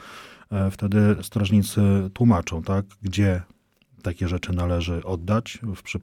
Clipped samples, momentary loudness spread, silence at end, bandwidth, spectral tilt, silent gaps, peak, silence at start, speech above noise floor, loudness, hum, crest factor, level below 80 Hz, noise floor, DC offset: under 0.1%; 12 LU; 0 s; 15.5 kHz; -7 dB/octave; none; -8 dBFS; 0 s; 22 dB; -24 LUFS; none; 16 dB; -42 dBFS; -44 dBFS; under 0.1%